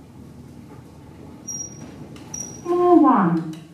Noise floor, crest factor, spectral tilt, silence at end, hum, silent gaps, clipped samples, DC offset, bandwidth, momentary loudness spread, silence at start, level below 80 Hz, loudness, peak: -42 dBFS; 20 dB; -6 dB/octave; 0.15 s; none; none; under 0.1%; under 0.1%; 12 kHz; 28 LU; 0.15 s; -56 dBFS; -19 LUFS; -2 dBFS